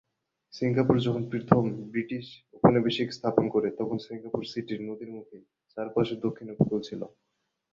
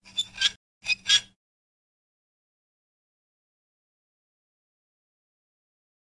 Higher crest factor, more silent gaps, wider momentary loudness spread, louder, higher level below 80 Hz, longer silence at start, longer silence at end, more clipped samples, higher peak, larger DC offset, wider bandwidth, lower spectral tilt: about the same, 26 dB vs 26 dB; second, none vs 0.56-0.81 s; first, 16 LU vs 10 LU; second, -28 LUFS vs -24 LUFS; first, -60 dBFS vs -68 dBFS; first, 0.55 s vs 0.15 s; second, 0.65 s vs 4.8 s; neither; first, -4 dBFS vs -8 dBFS; neither; second, 7.6 kHz vs 11.5 kHz; first, -8 dB/octave vs 3 dB/octave